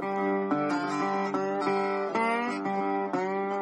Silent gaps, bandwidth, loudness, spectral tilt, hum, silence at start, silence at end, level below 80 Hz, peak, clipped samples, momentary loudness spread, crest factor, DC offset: none; 10 kHz; -29 LUFS; -6 dB/octave; none; 0 s; 0 s; -80 dBFS; -14 dBFS; under 0.1%; 2 LU; 14 dB; under 0.1%